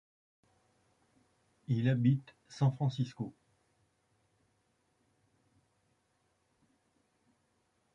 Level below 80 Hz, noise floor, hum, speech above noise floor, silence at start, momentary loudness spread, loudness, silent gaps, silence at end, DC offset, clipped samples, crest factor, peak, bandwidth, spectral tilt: -76 dBFS; -77 dBFS; none; 45 dB; 1.7 s; 16 LU; -33 LUFS; none; 4.65 s; under 0.1%; under 0.1%; 22 dB; -18 dBFS; 7.4 kHz; -8 dB/octave